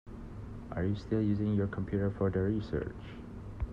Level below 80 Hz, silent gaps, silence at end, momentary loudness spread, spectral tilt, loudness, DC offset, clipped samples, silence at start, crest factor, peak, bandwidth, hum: -48 dBFS; none; 0 s; 15 LU; -9.5 dB/octave; -33 LUFS; under 0.1%; under 0.1%; 0.05 s; 16 dB; -18 dBFS; 6.8 kHz; none